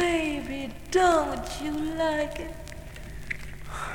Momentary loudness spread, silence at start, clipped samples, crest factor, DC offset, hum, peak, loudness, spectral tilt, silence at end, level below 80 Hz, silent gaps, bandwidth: 19 LU; 0 s; under 0.1%; 18 dB; under 0.1%; none; -12 dBFS; -28 LUFS; -4.5 dB/octave; 0 s; -42 dBFS; none; 19 kHz